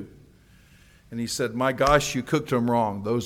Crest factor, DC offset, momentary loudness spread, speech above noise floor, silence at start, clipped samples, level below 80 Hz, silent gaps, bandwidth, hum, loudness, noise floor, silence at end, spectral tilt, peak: 22 dB; under 0.1%; 13 LU; 30 dB; 0 s; under 0.1%; -46 dBFS; none; 17 kHz; none; -24 LUFS; -54 dBFS; 0 s; -5 dB/octave; -4 dBFS